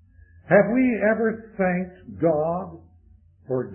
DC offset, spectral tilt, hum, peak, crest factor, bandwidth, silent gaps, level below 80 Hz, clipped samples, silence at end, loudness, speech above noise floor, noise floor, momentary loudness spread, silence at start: under 0.1%; -13 dB/octave; none; -4 dBFS; 20 dB; 3.2 kHz; none; -54 dBFS; under 0.1%; 0 s; -22 LUFS; 32 dB; -54 dBFS; 12 LU; 0.5 s